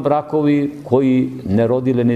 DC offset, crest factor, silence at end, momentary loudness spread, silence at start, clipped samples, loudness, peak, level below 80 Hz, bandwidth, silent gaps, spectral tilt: under 0.1%; 16 dB; 0 s; 4 LU; 0 s; under 0.1%; -17 LUFS; 0 dBFS; -52 dBFS; 8 kHz; none; -9.5 dB/octave